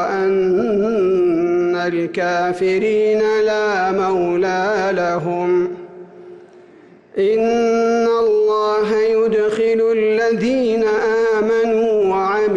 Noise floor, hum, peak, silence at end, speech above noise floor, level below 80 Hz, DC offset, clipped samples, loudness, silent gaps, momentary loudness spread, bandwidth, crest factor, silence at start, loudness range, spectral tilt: -45 dBFS; none; -10 dBFS; 0 s; 29 dB; -54 dBFS; under 0.1%; under 0.1%; -17 LUFS; none; 3 LU; 8 kHz; 8 dB; 0 s; 4 LU; -6 dB/octave